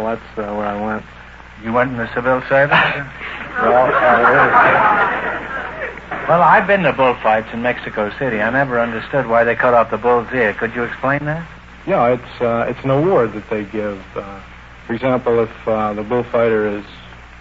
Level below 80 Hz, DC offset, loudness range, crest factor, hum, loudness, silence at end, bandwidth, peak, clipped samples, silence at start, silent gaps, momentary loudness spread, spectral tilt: -42 dBFS; under 0.1%; 6 LU; 16 dB; 60 Hz at -45 dBFS; -16 LUFS; 0 s; 7.6 kHz; 0 dBFS; under 0.1%; 0 s; none; 15 LU; -7.5 dB/octave